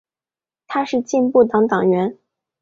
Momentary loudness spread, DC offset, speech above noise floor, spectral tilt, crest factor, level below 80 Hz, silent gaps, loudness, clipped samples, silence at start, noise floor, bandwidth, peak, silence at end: 10 LU; under 0.1%; over 74 dB; -6.5 dB/octave; 16 dB; -62 dBFS; none; -18 LUFS; under 0.1%; 0.7 s; under -90 dBFS; 7.6 kHz; -2 dBFS; 0.5 s